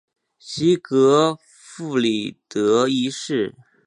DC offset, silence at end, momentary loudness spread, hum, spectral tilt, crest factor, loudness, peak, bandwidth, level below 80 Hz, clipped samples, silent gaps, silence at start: under 0.1%; 0.35 s; 13 LU; none; -5 dB/octave; 18 dB; -20 LUFS; -4 dBFS; 11 kHz; -66 dBFS; under 0.1%; none; 0.45 s